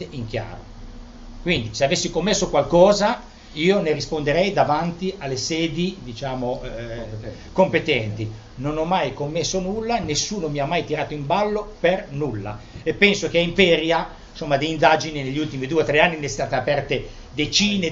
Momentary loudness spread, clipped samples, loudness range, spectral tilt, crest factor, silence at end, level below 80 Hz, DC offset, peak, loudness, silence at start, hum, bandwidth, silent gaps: 14 LU; under 0.1%; 5 LU; -4.5 dB/octave; 22 dB; 0 s; -42 dBFS; under 0.1%; 0 dBFS; -21 LUFS; 0 s; none; 8 kHz; none